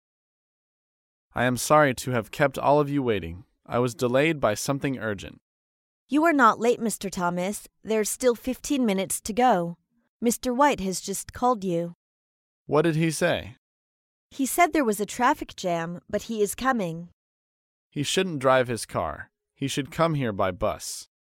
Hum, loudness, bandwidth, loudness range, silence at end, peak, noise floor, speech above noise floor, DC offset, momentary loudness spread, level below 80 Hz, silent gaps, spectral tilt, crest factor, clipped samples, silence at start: none; -25 LUFS; 17 kHz; 3 LU; 0.3 s; -6 dBFS; under -90 dBFS; over 65 dB; under 0.1%; 12 LU; -54 dBFS; 5.41-6.07 s, 10.08-10.20 s, 11.95-12.66 s, 13.58-14.30 s, 17.13-17.91 s; -4.5 dB/octave; 20 dB; under 0.1%; 1.35 s